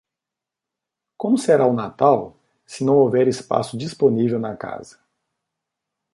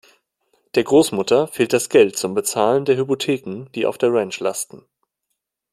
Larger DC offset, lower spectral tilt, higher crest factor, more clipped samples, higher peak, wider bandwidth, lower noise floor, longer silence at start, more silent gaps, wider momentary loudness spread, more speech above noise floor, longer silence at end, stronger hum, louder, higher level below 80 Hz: neither; first, -6.5 dB/octave vs -4 dB/octave; about the same, 18 dB vs 18 dB; neither; about the same, -2 dBFS vs -2 dBFS; second, 11.5 kHz vs 15 kHz; first, -86 dBFS vs -77 dBFS; first, 1.2 s vs 0.75 s; neither; first, 16 LU vs 9 LU; first, 67 dB vs 59 dB; first, 1.3 s vs 0.95 s; neither; about the same, -19 LUFS vs -19 LUFS; about the same, -62 dBFS vs -64 dBFS